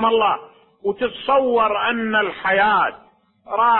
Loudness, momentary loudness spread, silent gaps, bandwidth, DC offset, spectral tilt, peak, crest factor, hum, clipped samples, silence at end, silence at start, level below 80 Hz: -19 LUFS; 10 LU; none; 4.3 kHz; under 0.1%; -8.5 dB/octave; -4 dBFS; 14 dB; none; under 0.1%; 0 s; 0 s; -56 dBFS